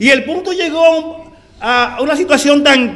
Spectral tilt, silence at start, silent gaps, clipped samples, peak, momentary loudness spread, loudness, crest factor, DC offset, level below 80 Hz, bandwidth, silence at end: -2.5 dB/octave; 0 s; none; 0.4%; 0 dBFS; 10 LU; -12 LUFS; 12 dB; under 0.1%; -48 dBFS; 12 kHz; 0 s